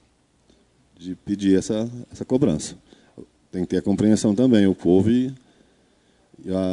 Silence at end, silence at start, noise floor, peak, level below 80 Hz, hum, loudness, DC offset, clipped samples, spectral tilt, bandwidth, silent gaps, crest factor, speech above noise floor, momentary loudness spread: 0 s; 1 s; -61 dBFS; -4 dBFS; -56 dBFS; none; -21 LUFS; under 0.1%; under 0.1%; -6.5 dB/octave; 11 kHz; none; 18 dB; 41 dB; 17 LU